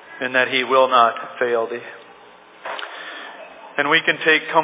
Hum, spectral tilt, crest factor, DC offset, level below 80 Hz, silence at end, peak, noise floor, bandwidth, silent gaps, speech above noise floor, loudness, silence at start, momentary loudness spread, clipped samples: none; -6.5 dB/octave; 18 dB; under 0.1%; -78 dBFS; 0 s; -2 dBFS; -46 dBFS; 4 kHz; none; 28 dB; -18 LUFS; 0.05 s; 19 LU; under 0.1%